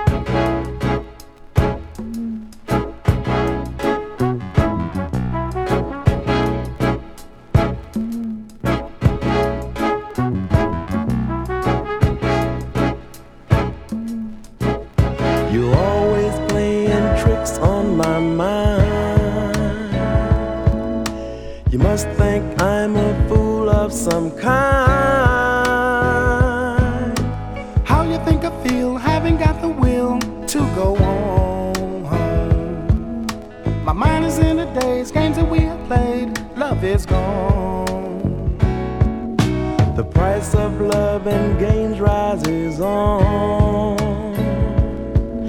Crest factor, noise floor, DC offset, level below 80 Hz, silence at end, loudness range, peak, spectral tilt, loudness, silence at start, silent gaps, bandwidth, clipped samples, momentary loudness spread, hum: 18 dB; -38 dBFS; under 0.1%; -26 dBFS; 0 s; 5 LU; 0 dBFS; -7 dB/octave; -19 LUFS; 0 s; none; 18.5 kHz; under 0.1%; 7 LU; none